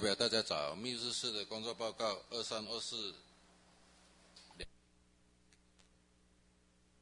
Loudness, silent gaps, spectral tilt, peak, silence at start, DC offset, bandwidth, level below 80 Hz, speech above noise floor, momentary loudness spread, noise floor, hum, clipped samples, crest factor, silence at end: -38 LUFS; none; -2.5 dB/octave; -18 dBFS; 0 s; under 0.1%; 11 kHz; -70 dBFS; 31 dB; 19 LU; -71 dBFS; 60 Hz at -75 dBFS; under 0.1%; 24 dB; 2.25 s